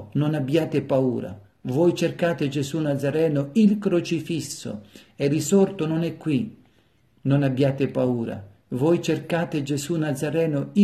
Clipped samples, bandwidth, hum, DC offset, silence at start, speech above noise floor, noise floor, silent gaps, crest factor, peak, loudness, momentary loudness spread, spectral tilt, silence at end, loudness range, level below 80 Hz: under 0.1%; 13.5 kHz; none; under 0.1%; 0 s; 39 dB; -61 dBFS; none; 16 dB; -8 dBFS; -24 LUFS; 11 LU; -6.5 dB/octave; 0 s; 2 LU; -62 dBFS